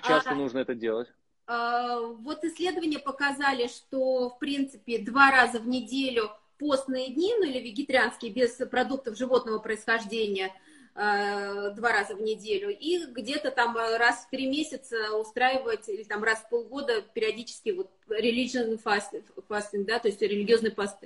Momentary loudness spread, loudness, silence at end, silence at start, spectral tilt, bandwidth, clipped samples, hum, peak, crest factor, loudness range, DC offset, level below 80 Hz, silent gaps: 9 LU; -28 LUFS; 0 s; 0 s; -3.5 dB/octave; 11.5 kHz; under 0.1%; none; -4 dBFS; 24 dB; 4 LU; under 0.1%; -68 dBFS; none